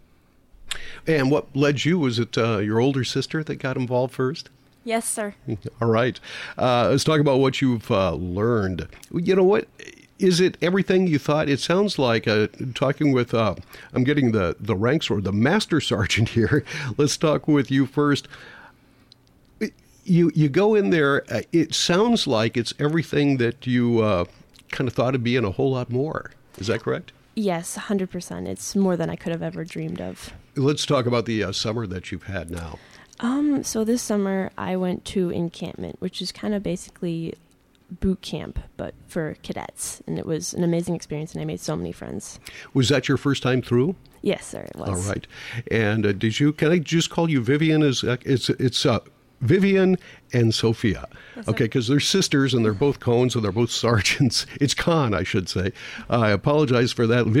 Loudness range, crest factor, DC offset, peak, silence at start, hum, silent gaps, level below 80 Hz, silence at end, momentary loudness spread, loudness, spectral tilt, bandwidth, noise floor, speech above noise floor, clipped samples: 7 LU; 14 dB; under 0.1%; -8 dBFS; 0.6 s; none; none; -48 dBFS; 0 s; 13 LU; -22 LUFS; -5.5 dB/octave; 16 kHz; -57 dBFS; 35 dB; under 0.1%